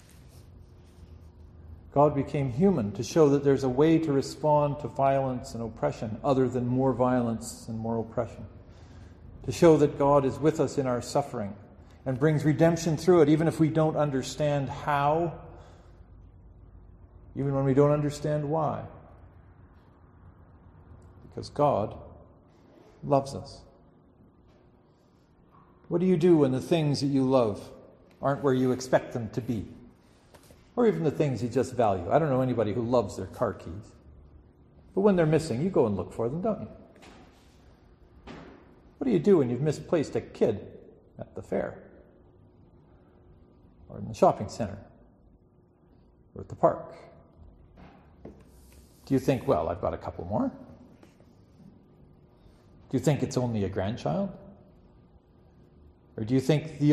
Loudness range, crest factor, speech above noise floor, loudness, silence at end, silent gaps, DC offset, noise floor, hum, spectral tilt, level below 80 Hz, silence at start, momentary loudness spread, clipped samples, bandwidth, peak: 10 LU; 22 dB; 35 dB; -27 LUFS; 0 s; none; under 0.1%; -61 dBFS; none; -7.5 dB/octave; -54 dBFS; 0.35 s; 18 LU; under 0.1%; 13 kHz; -6 dBFS